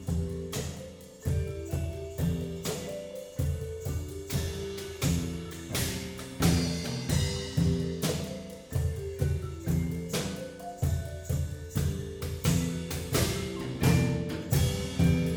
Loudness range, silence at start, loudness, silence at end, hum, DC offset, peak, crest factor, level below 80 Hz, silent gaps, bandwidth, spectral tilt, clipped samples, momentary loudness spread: 5 LU; 0 s; -31 LUFS; 0 s; none; under 0.1%; -12 dBFS; 18 dB; -40 dBFS; none; over 20 kHz; -5.5 dB/octave; under 0.1%; 10 LU